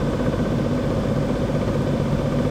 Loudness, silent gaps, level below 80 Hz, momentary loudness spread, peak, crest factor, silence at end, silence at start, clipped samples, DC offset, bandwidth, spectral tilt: -22 LUFS; none; -34 dBFS; 1 LU; -8 dBFS; 14 dB; 0 s; 0 s; under 0.1%; under 0.1%; 14.5 kHz; -7.5 dB/octave